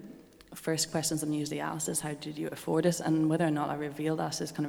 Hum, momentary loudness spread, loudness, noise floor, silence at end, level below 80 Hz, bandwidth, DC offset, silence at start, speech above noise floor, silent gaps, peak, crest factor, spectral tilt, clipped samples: none; 9 LU; -31 LUFS; -51 dBFS; 0 s; -66 dBFS; over 20 kHz; under 0.1%; 0 s; 20 dB; none; -14 dBFS; 18 dB; -4.5 dB/octave; under 0.1%